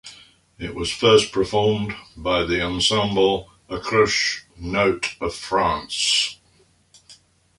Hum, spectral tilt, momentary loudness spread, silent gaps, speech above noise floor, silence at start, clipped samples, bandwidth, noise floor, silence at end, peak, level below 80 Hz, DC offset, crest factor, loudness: none; -3.5 dB/octave; 13 LU; none; 38 dB; 0.05 s; under 0.1%; 11.5 kHz; -59 dBFS; 0.45 s; -4 dBFS; -44 dBFS; under 0.1%; 18 dB; -20 LUFS